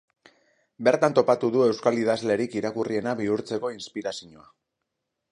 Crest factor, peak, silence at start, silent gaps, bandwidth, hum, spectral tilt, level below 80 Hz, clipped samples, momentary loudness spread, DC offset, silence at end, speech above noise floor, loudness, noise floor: 20 dB; -6 dBFS; 0.8 s; none; 11 kHz; none; -5.5 dB/octave; -70 dBFS; under 0.1%; 12 LU; under 0.1%; 1.05 s; 57 dB; -25 LUFS; -82 dBFS